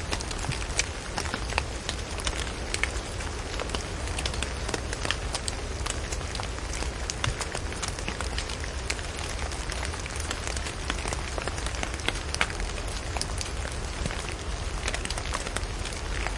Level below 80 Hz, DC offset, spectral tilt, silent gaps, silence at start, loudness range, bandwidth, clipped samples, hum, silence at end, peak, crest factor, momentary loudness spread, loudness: -36 dBFS; under 0.1%; -3 dB/octave; none; 0 s; 1 LU; 11.5 kHz; under 0.1%; none; 0 s; -4 dBFS; 26 dB; 4 LU; -31 LUFS